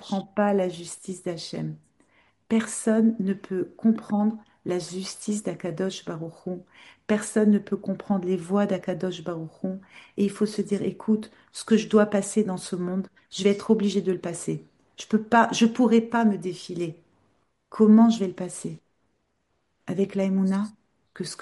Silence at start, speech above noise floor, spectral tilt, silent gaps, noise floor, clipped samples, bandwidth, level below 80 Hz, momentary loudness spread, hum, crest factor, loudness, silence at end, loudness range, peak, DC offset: 0 s; 49 dB; -6 dB/octave; none; -73 dBFS; under 0.1%; 11.5 kHz; -70 dBFS; 15 LU; none; 20 dB; -25 LUFS; 0.05 s; 5 LU; -4 dBFS; under 0.1%